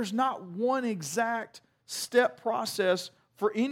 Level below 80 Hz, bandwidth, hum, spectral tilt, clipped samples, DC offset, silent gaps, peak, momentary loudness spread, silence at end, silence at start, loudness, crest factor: -80 dBFS; 16.5 kHz; none; -3.5 dB/octave; under 0.1%; under 0.1%; none; -10 dBFS; 10 LU; 0 s; 0 s; -30 LUFS; 18 dB